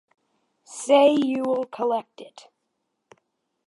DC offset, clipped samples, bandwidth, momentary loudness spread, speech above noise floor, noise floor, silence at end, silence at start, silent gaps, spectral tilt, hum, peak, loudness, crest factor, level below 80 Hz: under 0.1%; under 0.1%; 11.5 kHz; 20 LU; 55 dB; -77 dBFS; 1.4 s; 0.7 s; none; -3.5 dB/octave; none; -6 dBFS; -21 LUFS; 18 dB; -82 dBFS